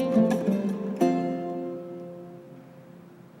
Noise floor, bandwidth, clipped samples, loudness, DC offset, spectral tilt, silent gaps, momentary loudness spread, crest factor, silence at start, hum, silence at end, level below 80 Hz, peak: -48 dBFS; 15.5 kHz; under 0.1%; -27 LUFS; under 0.1%; -8 dB/octave; none; 25 LU; 18 dB; 0 s; none; 0 s; -68 dBFS; -10 dBFS